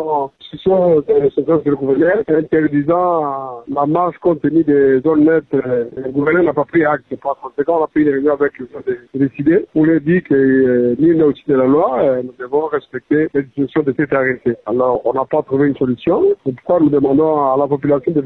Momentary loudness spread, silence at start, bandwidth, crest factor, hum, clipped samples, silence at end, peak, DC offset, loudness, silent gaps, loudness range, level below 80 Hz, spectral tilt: 8 LU; 0 s; 4.1 kHz; 10 dB; none; under 0.1%; 0 s; -4 dBFS; under 0.1%; -15 LUFS; none; 3 LU; -50 dBFS; -11 dB/octave